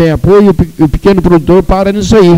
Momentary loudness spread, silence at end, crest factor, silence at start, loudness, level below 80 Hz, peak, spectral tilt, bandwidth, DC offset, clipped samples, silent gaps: 4 LU; 0 s; 6 dB; 0 s; -7 LUFS; -20 dBFS; 0 dBFS; -7.5 dB/octave; 15.5 kHz; under 0.1%; 0.6%; none